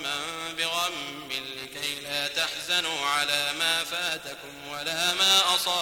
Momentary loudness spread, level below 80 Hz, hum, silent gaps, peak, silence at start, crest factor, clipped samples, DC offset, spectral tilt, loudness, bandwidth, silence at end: 14 LU; -64 dBFS; none; none; -10 dBFS; 0 s; 20 dB; under 0.1%; under 0.1%; 0 dB/octave; -25 LUFS; 19 kHz; 0 s